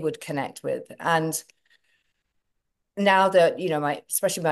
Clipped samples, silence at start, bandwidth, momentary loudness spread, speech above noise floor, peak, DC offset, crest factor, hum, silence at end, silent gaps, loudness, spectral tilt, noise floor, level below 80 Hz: under 0.1%; 0 s; 13 kHz; 13 LU; 54 dB; -6 dBFS; under 0.1%; 20 dB; none; 0 s; none; -24 LUFS; -4 dB/octave; -77 dBFS; -74 dBFS